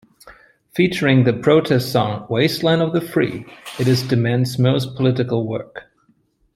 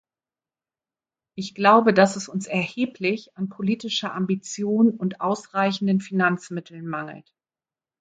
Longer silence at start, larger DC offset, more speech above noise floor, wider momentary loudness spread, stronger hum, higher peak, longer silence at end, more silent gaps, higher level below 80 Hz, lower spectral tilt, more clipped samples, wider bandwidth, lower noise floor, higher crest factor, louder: second, 0.25 s vs 1.35 s; neither; second, 43 dB vs over 67 dB; second, 13 LU vs 16 LU; neither; about the same, -2 dBFS vs -4 dBFS; about the same, 0.75 s vs 0.8 s; neither; first, -56 dBFS vs -70 dBFS; about the same, -6.5 dB/octave vs -5.5 dB/octave; neither; first, 15 kHz vs 9.2 kHz; second, -61 dBFS vs under -90 dBFS; about the same, 16 dB vs 20 dB; first, -18 LUFS vs -23 LUFS